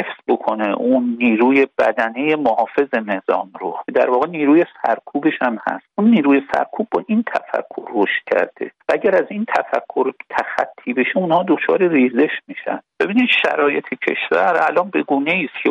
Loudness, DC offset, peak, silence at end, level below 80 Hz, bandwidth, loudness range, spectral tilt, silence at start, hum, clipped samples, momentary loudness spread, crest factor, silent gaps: -18 LUFS; under 0.1%; -2 dBFS; 0 s; -64 dBFS; 7.6 kHz; 3 LU; -7 dB/octave; 0 s; none; under 0.1%; 8 LU; 16 dB; none